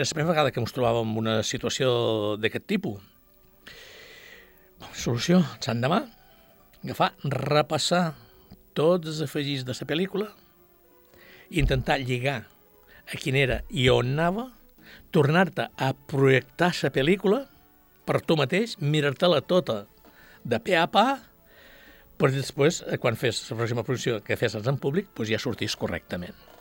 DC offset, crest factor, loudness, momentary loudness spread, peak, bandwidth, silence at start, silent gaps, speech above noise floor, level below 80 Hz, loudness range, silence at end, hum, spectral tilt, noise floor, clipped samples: under 0.1%; 20 dB; -26 LUFS; 14 LU; -6 dBFS; 17 kHz; 0 s; none; 33 dB; -46 dBFS; 5 LU; 0.3 s; none; -5.5 dB/octave; -58 dBFS; under 0.1%